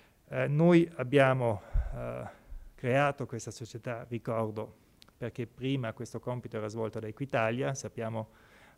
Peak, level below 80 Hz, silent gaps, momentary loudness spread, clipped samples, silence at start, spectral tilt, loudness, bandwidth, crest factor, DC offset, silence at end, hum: -12 dBFS; -46 dBFS; none; 16 LU; under 0.1%; 0.3 s; -6.5 dB/octave; -32 LUFS; 13 kHz; 20 dB; under 0.1%; 0.55 s; none